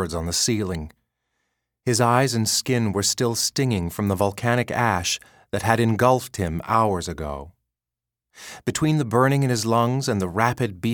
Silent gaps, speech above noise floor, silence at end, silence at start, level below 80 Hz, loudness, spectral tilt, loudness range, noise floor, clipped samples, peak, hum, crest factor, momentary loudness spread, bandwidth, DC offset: none; 66 dB; 0 s; 0 s; -46 dBFS; -22 LUFS; -4.5 dB/octave; 3 LU; -88 dBFS; under 0.1%; 0 dBFS; none; 22 dB; 12 LU; 19 kHz; under 0.1%